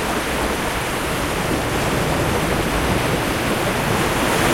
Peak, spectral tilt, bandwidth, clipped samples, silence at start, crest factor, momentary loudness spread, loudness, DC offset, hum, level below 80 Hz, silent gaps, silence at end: -6 dBFS; -4 dB/octave; 16.5 kHz; under 0.1%; 0 s; 14 dB; 3 LU; -20 LUFS; under 0.1%; none; -32 dBFS; none; 0 s